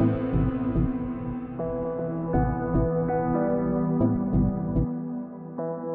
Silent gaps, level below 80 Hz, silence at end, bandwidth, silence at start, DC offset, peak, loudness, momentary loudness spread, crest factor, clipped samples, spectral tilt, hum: none; -36 dBFS; 0 s; 3.6 kHz; 0 s; under 0.1%; -12 dBFS; -27 LUFS; 8 LU; 14 dB; under 0.1%; -10.5 dB/octave; none